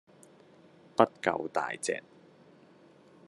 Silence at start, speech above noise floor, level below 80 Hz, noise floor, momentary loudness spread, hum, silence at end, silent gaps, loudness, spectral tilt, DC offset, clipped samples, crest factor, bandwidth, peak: 1 s; 29 dB; -80 dBFS; -59 dBFS; 9 LU; none; 1.3 s; none; -31 LUFS; -4 dB/octave; under 0.1%; under 0.1%; 30 dB; 12 kHz; -4 dBFS